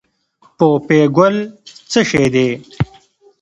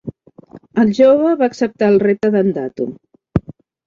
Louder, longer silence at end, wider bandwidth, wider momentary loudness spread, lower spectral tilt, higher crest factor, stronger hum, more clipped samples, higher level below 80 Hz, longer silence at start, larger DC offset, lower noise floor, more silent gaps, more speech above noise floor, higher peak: about the same, -15 LUFS vs -15 LUFS; first, 0.55 s vs 0.35 s; first, 11 kHz vs 7.6 kHz; about the same, 11 LU vs 13 LU; second, -6 dB/octave vs -8 dB/octave; about the same, 16 dB vs 14 dB; neither; neither; about the same, -46 dBFS vs -44 dBFS; first, 0.6 s vs 0.05 s; neither; first, -54 dBFS vs -42 dBFS; neither; first, 41 dB vs 28 dB; about the same, 0 dBFS vs -2 dBFS